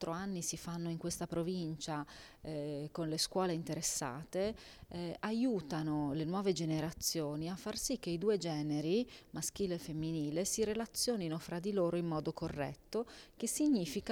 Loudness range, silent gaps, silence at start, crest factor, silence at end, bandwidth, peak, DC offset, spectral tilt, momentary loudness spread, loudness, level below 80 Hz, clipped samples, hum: 2 LU; none; 0 s; 18 dB; 0 s; 18.5 kHz; -20 dBFS; under 0.1%; -4.5 dB/octave; 7 LU; -38 LUFS; -62 dBFS; under 0.1%; none